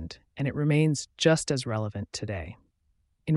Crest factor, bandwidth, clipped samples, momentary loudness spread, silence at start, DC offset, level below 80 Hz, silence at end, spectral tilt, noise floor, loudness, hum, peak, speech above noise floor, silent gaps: 20 dB; 11.5 kHz; under 0.1%; 15 LU; 0 s; under 0.1%; -54 dBFS; 0 s; -5.5 dB/octave; -71 dBFS; -28 LUFS; none; -8 dBFS; 44 dB; none